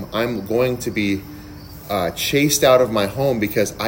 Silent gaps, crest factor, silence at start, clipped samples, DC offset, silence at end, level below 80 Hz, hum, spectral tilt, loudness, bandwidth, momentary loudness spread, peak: none; 18 dB; 0 s; under 0.1%; under 0.1%; 0 s; -44 dBFS; none; -4 dB/octave; -19 LUFS; 16.5 kHz; 19 LU; -2 dBFS